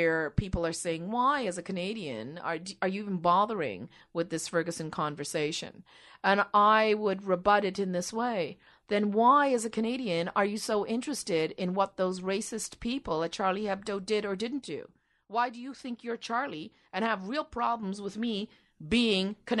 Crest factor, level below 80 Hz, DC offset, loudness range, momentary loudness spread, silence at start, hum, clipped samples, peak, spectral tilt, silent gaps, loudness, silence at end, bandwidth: 20 dB; -54 dBFS; under 0.1%; 6 LU; 12 LU; 0 s; none; under 0.1%; -10 dBFS; -4.5 dB/octave; none; -30 LUFS; 0 s; 12 kHz